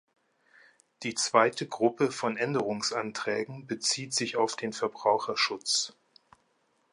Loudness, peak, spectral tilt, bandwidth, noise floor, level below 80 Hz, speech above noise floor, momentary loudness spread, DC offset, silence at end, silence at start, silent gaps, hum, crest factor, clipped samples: -29 LUFS; -8 dBFS; -2.5 dB/octave; 11.5 kHz; -72 dBFS; -78 dBFS; 43 dB; 8 LU; under 0.1%; 1 s; 1 s; none; none; 24 dB; under 0.1%